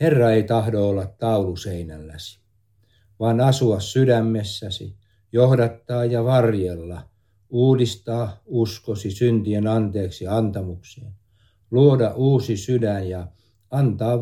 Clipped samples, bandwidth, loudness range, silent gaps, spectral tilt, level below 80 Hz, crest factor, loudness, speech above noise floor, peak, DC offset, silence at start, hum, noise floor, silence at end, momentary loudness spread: under 0.1%; 13.5 kHz; 3 LU; none; -7.5 dB/octave; -52 dBFS; 18 dB; -21 LUFS; 42 dB; -2 dBFS; under 0.1%; 0 s; none; -62 dBFS; 0 s; 16 LU